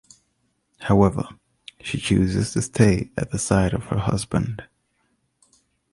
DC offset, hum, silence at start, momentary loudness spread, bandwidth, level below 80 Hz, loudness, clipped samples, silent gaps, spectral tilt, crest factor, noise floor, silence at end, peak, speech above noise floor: under 0.1%; none; 0.8 s; 13 LU; 11.5 kHz; -40 dBFS; -22 LUFS; under 0.1%; none; -6 dB/octave; 20 dB; -70 dBFS; 1.3 s; -2 dBFS; 49 dB